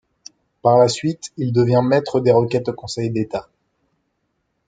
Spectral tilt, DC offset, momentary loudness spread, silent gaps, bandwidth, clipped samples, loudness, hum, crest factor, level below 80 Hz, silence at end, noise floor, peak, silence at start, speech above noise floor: -6.5 dB/octave; under 0.1%; 11 LU; none; 9.4 kHz; under 0.1%; -18 LUFS; none; 18 dB; -58 dBFS; 1.25 s; -71 dBFS; -2 dBFS; 0.65 s; 54 dB